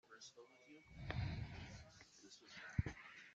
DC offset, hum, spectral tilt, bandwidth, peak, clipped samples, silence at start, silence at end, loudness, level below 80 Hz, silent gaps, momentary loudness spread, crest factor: under 0.1%; none; -5.5 dB/octave; 8 kHz; -26 dBFS; under 0.1%; 0.05 s; 0 s; -50 LUFS; -60 dBFS; none; 17 LU; 26 dB